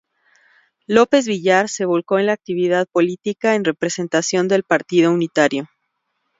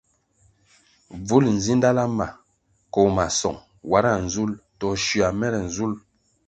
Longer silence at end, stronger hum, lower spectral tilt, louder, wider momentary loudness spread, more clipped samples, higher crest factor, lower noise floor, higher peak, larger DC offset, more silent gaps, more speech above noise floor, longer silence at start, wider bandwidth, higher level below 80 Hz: first, 0.75 s vs 0.5 s; neither; about the same, -4.5 dB/octave vs -5 dB/octave; first, -18 LUFS vs -22 LUFS; second, 5 LU vs 11 LU; neither; about the same, 18 dB vs 20 dB; first, -73 dBFS vs -66 dBFS; about the same, 0 dBFS vs -2 dBFS; neither; neither; first, 55 dB vs 44 dB; second, 0.9 s vs 1.1 s; second, 7.8 kHz vs 9 kHz; second, -66 dBFS vs -46 dBFS